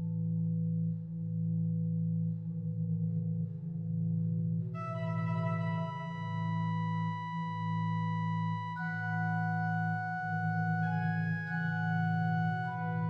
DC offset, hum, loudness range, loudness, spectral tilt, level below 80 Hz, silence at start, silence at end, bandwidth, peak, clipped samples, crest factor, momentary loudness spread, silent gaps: under 0.1%; none; 2 LU; -34 LUFS; -9.5 dB/octave; -70 dBFS; 0 s; 0 s; 5.2 kHz; -22 dBFS; under 0.1%; 12 dB; 5 LU; none